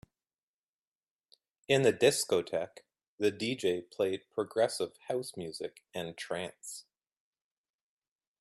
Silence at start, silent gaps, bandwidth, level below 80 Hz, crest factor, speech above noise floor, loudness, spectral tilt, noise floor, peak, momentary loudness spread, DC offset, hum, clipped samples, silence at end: 1.7 s; 3.08-3.18 s; 14 kHz; -76 dBFS; 22 dB; over 58 dB; -33 LUFS; -4 dB/octave; under -90 dBFS; -12 dBFS; 14 LU; under 0.1%; none; under 0.1%; 1.6 s